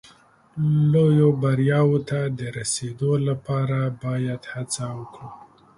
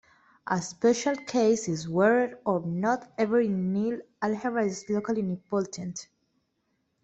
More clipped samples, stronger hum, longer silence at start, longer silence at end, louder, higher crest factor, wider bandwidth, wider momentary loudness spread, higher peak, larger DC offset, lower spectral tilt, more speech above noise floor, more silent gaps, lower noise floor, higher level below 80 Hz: neither; neither; about the same, 0.55 s vs 0.45 s; second, 0.4 s vs 1 s; first, -22 LUFS vs -27 LUFS; about the same, 16 dB vs 18 dB; first, 11.5 kHz vs 8.2 kHz; first, 15 LU vs 8 LU; first, -6 dBFS vs -10 dBFS; neither; about the same, -6.5 dB/octave vs -5.5 dB/octave; second, 32 dB vs 49 dB; neither; second, -54 dBFS vs -75 dBFS; first, -58 dBFS vs -68 dBFS